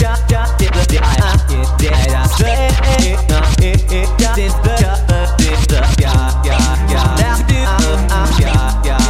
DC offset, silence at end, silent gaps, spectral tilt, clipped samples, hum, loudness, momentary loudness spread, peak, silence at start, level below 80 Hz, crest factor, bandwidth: under 0.1%; 0 s; none; -5 dB/octave; under 0.1%; none; -13 LUFS; 2 LU; 0 dBFS; 0 s; -12 dBFS; 10 dB; 15.5 kHz